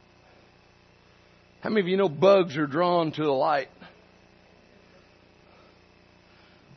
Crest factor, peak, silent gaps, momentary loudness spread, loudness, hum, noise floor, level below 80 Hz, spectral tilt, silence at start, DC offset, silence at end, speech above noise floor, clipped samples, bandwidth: 22 dB; -6 dBFS; none; 9 LU; -24 LUFS; 60 Hz at -60 dBFS; -58 dBFS; -70 dBFS; -7 dB/octave; 1.65 s; under 0.1%; 2.9 s; 35 dB; under 0.1%; 6.4 kHz